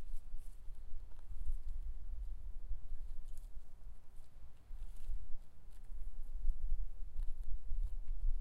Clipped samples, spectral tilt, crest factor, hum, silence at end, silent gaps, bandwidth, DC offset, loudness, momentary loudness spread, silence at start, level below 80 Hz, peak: under 0.1%; -6.5 dB/octave; 14 dB; none; 0 s; none; 1 kHz; under 0.1%; -51 LUFS; 14 LU; 0 s; -40 dBFS; -20 dBFS